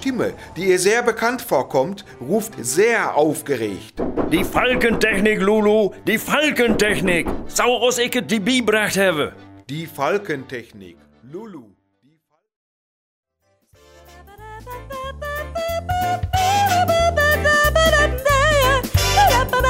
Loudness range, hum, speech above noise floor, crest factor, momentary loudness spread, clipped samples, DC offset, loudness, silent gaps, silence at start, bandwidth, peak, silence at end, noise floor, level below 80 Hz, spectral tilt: 13 LU; none; 44 dB; 18 dB; 16 LU; under 0.1%; under 0.1%; -18 LUFS; 12.56-13.23 s; 0 s; 16.5 kHz; -2 dBFS; 0 s; -63 dBFS; -34 dBFS; -4 dB/octave